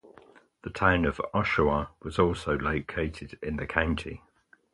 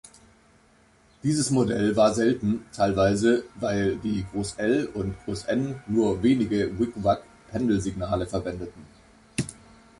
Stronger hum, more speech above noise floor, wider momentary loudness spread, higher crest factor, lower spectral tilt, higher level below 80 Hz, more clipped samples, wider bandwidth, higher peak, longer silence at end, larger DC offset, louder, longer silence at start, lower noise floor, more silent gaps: neither; second, 28 dB vs 34 dB; first, 14 LU vs 11 LU; first, 24 dB vs 18 dB; about the same, -6.5 dB/octave vs -6 dB/octave; first, -42 dBFS vs -48 dBFS; neither; about the same, 11.5 kHz vs 11.5 kHz; about the same, -6 dBFS vs -8 dBFS; about the same, 0.55 s vs 0.45 s; neither; second, -28 LUFS vs -25 LUFS; second, 0.05 s vs 1.25 s; about the same, -56 dBFS vs -59 dBFS; neither